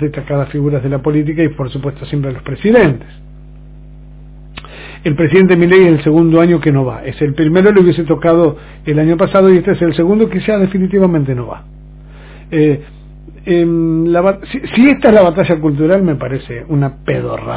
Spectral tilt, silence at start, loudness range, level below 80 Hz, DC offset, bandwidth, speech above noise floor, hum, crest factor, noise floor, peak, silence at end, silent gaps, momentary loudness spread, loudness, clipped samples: -12 dB/octave; 0 s; 6 LU; -36 dBFS; under 0.1%; 4 kHz; 23 dB; none; 12 dB; -34 dBFS; 0 dBFS; 0 s; none; 13 LU; -12 LUFS; 0.4%